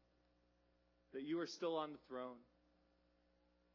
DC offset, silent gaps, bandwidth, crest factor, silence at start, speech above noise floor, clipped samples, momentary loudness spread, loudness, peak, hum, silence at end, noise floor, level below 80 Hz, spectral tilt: under 0.1%; none; 6 kHz; 20 dB; 1.15 s; 32 dB; under 0.1%; 11 LU; -47 LUFS; -30 dBFS; 60 Hz at -85 dBFS; 1.3 s; -78 dBFS; -84 dBFS; -3.5 dB/octave